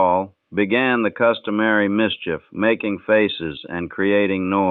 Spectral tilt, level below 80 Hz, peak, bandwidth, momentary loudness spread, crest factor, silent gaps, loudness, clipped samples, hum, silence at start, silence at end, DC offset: -9 dB/octave; -56 dBFS; -4 dBFS; 4.3 kHz; 10 LU; 16 dB; none; -20 LUFS; under 0.1%; none; 0 s; 0 s; under 0.1%